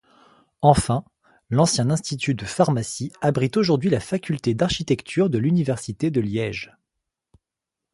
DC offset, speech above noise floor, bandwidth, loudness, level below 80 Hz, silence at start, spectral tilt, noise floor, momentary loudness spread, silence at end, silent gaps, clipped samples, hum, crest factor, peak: under 0.1%; 65 dB; 11.5 kHz; -22 LUFS; -46 dBFS; 0.6 s; -5.5 dB/octave; -86 dBFS; 7 LU; 1.3 s; none; under 0.1%; none; 22 dB; 0 dBFS